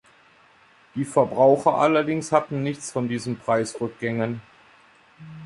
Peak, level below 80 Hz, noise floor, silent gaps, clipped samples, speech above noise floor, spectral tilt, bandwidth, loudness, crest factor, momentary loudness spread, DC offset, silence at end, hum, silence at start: -4 dBFS; -64 dBFS; -55 dBFS; none; under 0.1%; 33 dB; -6 dB/octave; 11.5 kHz; -23 LUFS; 20 dB; 12 LU; under 0.1%; 0 s; none; 0.95 s